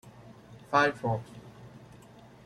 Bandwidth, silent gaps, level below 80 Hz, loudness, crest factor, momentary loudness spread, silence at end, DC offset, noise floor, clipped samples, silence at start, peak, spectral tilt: 13 kHz; none; -64 dBFS; -28 LUFS; 24 dB; 26 LU; 0.6 s; under 0.1%; -53 dBFS; under 0.1%; 0.05 s; -10 dBFS; -5.5 dB/octave